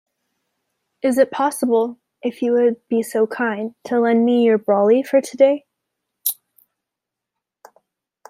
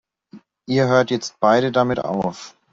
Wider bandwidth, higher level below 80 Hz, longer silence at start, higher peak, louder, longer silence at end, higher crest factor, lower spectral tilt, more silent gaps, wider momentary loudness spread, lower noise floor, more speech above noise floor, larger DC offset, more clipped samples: first, 16 kHz vs 7.8 kHz; second, -74 dBFS vs -58 dBFS; first, 1.05 s vs 0.35 s; about the same, -2 dBFS vs -2 dBFS; about the same, -19 LUFS vs -19 LUFS; first, 1.95 s vs 0.25 s; about the same, 18 dB vs 18 dB; about the same, -5 dB/octave vs -6 dB/octave; neither; about the same, 10 LU vs 8 LU; first, -84 dBFS vs -47 dBFS; first, 67 dB vs 28 dB; neither; neither